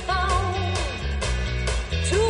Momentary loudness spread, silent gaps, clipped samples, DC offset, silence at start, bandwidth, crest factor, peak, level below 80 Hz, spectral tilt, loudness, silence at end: 4 LU; none; under 0.1%; under 0.1%; 0 s; 11 kHz; 14 dB; -10 dBFS; -28 dBFS; -4.5 dB/octave; -25 LUFS; 0 s